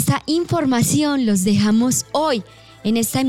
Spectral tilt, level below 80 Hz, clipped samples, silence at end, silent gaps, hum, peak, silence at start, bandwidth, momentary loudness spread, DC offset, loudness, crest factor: -4.5 dB/octave; -50 dBFS; under 0.1%; 0 s; none; none; -6 dBFS; 0 s; 17 kHz; 5 LU; 0.3%; -18 LUFS; 12 dB